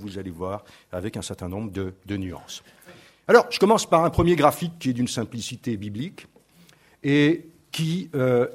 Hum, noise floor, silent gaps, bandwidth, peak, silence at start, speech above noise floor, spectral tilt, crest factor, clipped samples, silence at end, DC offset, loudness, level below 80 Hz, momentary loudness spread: none; -55 dBFS; none; 16 kHz; 0 dBFS; 0 s; 32 dB; -5.5 dB/octave; 22 dB; under 0.1%; 0 s; under 0.1%; -23 LUFS; -48 dBFS; 17 LU